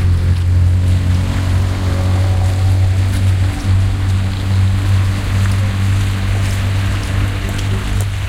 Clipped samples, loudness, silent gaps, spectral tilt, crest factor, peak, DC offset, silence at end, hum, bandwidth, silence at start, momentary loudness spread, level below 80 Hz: under 0.1%; -15 LUFS; none; -6 dB/octave; 12 dB; -2 dBFS; under 0.1%; 0 s; none; 13 kHz; 0 s; 4 LU; -22 dBFS